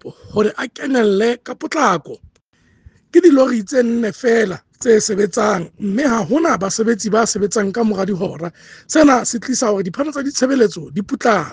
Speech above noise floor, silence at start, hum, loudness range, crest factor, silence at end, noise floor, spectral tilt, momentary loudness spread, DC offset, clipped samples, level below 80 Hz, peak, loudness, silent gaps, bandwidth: 41 dB; 0.05 s; none; 2 LU; 16 dB; 0 s; -57 dBFS; -4.5 dB/octave; 10 LU; under 0.1%; under 0.1%; -54 dBFS; 0 dBFS; -16 LUFS; none; 10 kHz